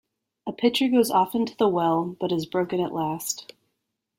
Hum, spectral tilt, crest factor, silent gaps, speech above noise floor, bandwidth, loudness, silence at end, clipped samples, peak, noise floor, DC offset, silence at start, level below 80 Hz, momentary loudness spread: none; -4.5 dB/octave; 16 dB; none; 56 dB; 16.5 kHz; -24 LUFS; 0.75 s; under 0.1%; -8 dBFS; -79 dBFS; under 0.1%; 0.45 s; -66 dBFS; 10 LU